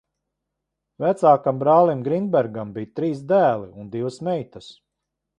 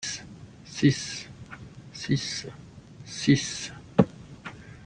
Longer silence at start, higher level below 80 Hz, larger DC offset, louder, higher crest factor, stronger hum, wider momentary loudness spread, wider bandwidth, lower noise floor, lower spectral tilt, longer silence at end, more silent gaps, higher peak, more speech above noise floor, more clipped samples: first, 1 s vs 0 s; second, -64 dBFS vs -56 dBFS; neither; first, -21 LUFS vs -27 LUFS; second, 20 dB vs 26 dB; neither; second, 13 LU vs 22 LU; about the same, 10.5 kHz vs 10 kHz; first, -81 dBFS vs -46 dBFS; first, -8 dB/octave vs -5 dB/octave; first, 0.65 s vs 0 s; neither; about the same, -2 dBFS vs -4 dBFS; first, 61 dB vs 20 dB; neither